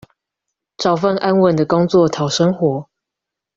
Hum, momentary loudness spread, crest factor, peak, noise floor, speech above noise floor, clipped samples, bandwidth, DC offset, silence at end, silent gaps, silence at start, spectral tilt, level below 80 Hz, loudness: none; 6 LU; 16 dB; -2 dBFS; -83 dBFS; 68 dB; under 0.1%; 7.6 kHz; under 0.1%; 0.75 s; none; 0.8 s; -6 dB/octave; -54 dBFS; -16 LUFS